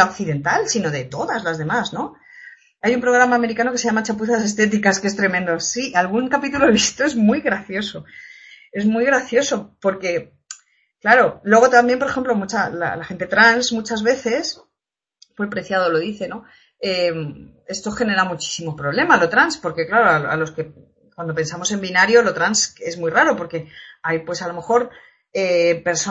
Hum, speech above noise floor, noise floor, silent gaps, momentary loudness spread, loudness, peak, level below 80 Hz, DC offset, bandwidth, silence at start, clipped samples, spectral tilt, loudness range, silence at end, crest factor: none; 67 dB; -85 dBFS; none; 15 LU; -18 LUFS; 0 dBFS; -56 dBFS; under 0.1%; 8.2 kHz; 0 s; under 0.1%; -3.5 dB/octave; 5 LU; 0 s; 20 dB